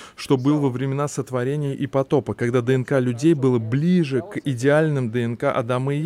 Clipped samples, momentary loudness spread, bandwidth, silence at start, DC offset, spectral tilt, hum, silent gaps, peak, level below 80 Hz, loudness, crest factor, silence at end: under 0.1%; 6 LU; 13.5 kHz; 0 s; under 0.1%; -7 dB/octave; none; none; -6 dBFS; -60 dBFS; -21 LUFS; 14 dB; 0 s